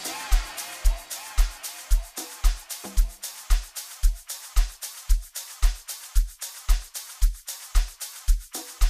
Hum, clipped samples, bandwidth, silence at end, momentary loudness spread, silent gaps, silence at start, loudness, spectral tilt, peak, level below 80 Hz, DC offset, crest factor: none; under 0.1%; 15.5 kHz; 0 s; 7 LU; none; 0 s; -30 LUFS; -2.5 dB/octave; -8 dBFS; -24 dBFS; under 0.1%; 16 dB